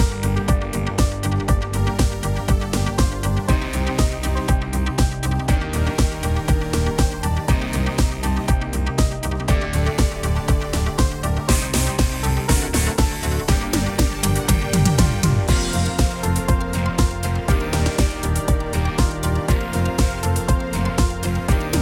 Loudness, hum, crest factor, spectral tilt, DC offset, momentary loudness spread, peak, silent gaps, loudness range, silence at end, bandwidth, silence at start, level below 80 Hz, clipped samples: -21 LUFS; none; 16 dB; -5 dB/octave; under 0.1%; 3 LU; -2 dBFS; none; 2 LU; 0 s; 17 kHz; 0 s; -22 dBFS; under 0.1%